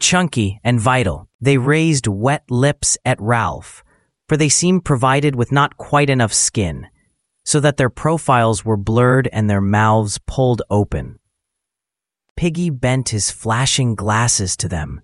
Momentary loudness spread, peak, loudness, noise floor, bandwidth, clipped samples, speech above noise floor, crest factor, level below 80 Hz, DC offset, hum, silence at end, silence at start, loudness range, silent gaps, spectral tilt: 7 LU; 0 dBFS; -16 LUFS; -85 dBFS; 11.5 kHz; under 0.1%; 69 dB; 16 dB; -40 dBFS; under 0.1%; none; 0.05 s; 0 s; 4 LU; 1.34-1.39 s, 12.30-12.36 s; -4.5 dB/octave